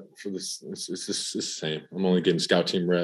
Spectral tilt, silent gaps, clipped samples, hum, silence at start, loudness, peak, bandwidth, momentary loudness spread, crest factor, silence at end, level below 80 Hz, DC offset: -4.5 dB/octave; none; under 0.1%; none; 0 s; -27 LUFS; -6 dBFS; 12.5 kHz; 11 LU; 20 dB; 0 s; -76 dBFS; under 0.1%